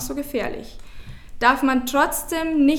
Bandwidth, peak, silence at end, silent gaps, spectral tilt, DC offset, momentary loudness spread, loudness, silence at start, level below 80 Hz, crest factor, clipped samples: 18.5 kHz; -2 dBFS; 0 s; none; -3.5 dB/octave; under 0.1%; 10 LU; -21 LUFS; 0 s; -40 dBFS; 20 dB; under 0.1%